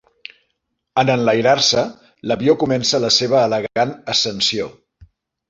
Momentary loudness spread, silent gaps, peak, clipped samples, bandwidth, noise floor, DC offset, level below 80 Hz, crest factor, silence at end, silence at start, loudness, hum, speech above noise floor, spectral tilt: 10 LU; none; -2 dBFS; under 0.1%; 8 kHz; -73 dBFS; under 0.1%; -56 dBFS; 16 dB; 0.8 s; 0.95 s; -17 LUFS; none; 56 dB; -3.5 dB/octave